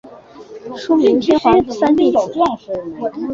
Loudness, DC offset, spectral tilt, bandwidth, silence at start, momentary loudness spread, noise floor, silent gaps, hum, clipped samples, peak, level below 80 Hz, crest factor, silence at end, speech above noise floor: -15 LUFS; under 0.1%; -6 dB/octave; 7.6 kHz; 0.05 s; 14 LU; -38 dBFS; none; none; under 0.1%; -2 dBFS; -46 dBFS; 14 dB; 0 s; 23 dB